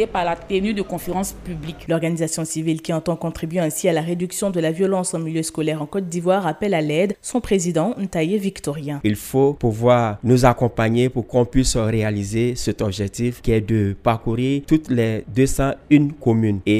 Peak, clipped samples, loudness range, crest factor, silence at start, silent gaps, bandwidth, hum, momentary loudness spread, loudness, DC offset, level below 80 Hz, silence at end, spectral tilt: 0 dBFS; under 0.1%; 4 LU; 20 dB; 0 s; none; 15.5 kHz; none; 8 LU; -20 LUFS; under 0.1%; -38 dBFS; 0 s; -6 dB/octave